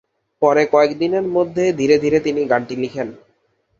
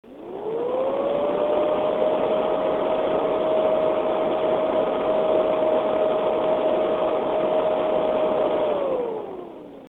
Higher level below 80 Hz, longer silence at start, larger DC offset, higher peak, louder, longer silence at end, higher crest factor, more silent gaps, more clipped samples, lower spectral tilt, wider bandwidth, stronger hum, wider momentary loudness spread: about the same, -56 dBFS vs -56 dBFS; first, 0.4 s vs 0.05 s; neither; first, -2 dBFS vs -8 dBFS; first, -17 LUFS vs -22 LUFS; first, 0.65 s vs 0 s; about the same, 16 dB vs 14 dB; neither; neither; second, -6 dB/octave vs -7.5 dB/octave; first, 7.4 kHz vs 4.2 kHz; neither; first, 10 LU vs 6 LU